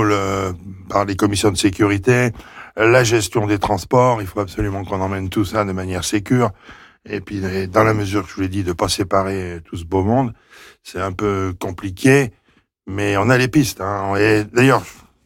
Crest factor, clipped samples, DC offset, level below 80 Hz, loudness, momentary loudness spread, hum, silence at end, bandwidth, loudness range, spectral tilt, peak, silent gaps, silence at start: 14 dB; under 0.1%; under 0.1%; -42 dBFS; -18 LUFS; 12 LU; none; 0.3 s; 17 kHz; 5 LU; -5.5 dB/octave; -4 dBFS; none; 0 s